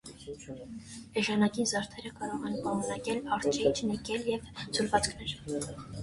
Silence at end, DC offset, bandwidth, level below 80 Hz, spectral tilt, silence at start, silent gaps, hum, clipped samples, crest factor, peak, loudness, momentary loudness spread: 0 s; under 0.1%; 11.5 kHz; -56 dBFS; -4 dB/octave; 0.05 s; none; none; under 0.1%; 22 dB; -10 dBFS; -32 LUFS; 16 LU